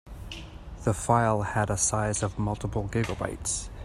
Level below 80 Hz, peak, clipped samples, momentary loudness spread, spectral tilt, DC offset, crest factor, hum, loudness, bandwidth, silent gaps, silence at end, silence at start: -42 dBFS; -6 dBFS; under 0.1%; 17 LU; -4.5 dB/octave; under 0.1%; 22 dB; none; -28 LUFS; 14 kHz; none; 0 s; 0.05 s